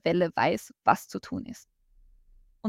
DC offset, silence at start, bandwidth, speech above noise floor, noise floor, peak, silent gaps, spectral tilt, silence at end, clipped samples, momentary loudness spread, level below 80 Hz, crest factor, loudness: under 0.1%; 0.05 s; 16 kHz; 31 dB; -59 dBFS; -6 dBFS; none; -5.5 dB/octave; 0 s; under 0.1%; 15 LU; -60 dBFS; 22 dB; -28 LUFS